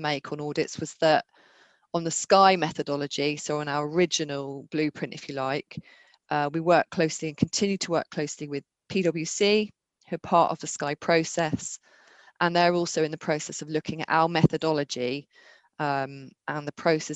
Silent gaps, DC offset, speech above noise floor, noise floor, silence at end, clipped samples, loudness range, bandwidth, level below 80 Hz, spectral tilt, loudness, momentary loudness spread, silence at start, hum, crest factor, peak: none; under 0.1%; 34 dB; -60 dBFS; 0 s; under 0.1%; 3 LU; 9.2 kHz; -64 dBFS; -4.5 dB/octave; -26 LUFS; 12 LU; 0 s; none; 22 dB; -4 dBFS